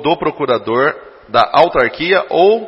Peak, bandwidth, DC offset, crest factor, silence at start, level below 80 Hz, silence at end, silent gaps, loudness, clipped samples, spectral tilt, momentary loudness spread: 0 dBFS; 6.4 kHz; under 0.1%; 14 dB; 0 s; -46 dBFS; 0 s; none; -14 LUFS; under 0.1%; -7 dB/octave; 6 LU